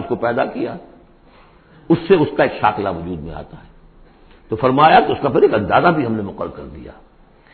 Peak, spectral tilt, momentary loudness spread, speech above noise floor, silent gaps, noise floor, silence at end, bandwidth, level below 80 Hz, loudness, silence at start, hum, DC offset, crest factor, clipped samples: 0 dBFS; -11.5 dB/octave; 20 LU; 31 dB; none; -47 dBFS; 0.6 s; 4.5 kHz; -44 dBFS; -16 LUFS; 0 s; none; under 0.1%; 18 dB; under 0.1%